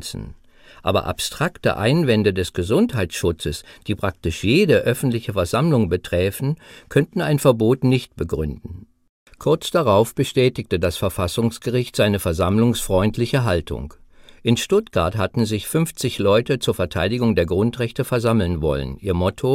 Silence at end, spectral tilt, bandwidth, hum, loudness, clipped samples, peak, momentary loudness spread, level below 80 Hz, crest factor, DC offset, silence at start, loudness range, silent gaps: 0 s; -6 dB/octave; 16.5 kHz; none; -20 LUFS; under 0.1%; -2 dBFS; 9 LU; -40 dBFS; 18 dB; under 0.1%; 0 s; 1 LU; 9.09-9.26 s